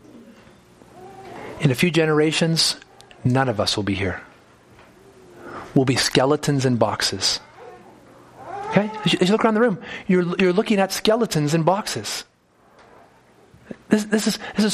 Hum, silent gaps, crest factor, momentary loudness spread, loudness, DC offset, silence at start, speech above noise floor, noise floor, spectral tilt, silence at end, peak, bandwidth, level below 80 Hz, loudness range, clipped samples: none; none; 22 dB; 16 LU; -20 LUFS; under 0.1%; 0.15 s; 36 dB; -56 dBFS; -4.5 dB/octave; 0 s; 0 dBFS; 15 kHz; -56 dBFS; 4 LU; under 0.1%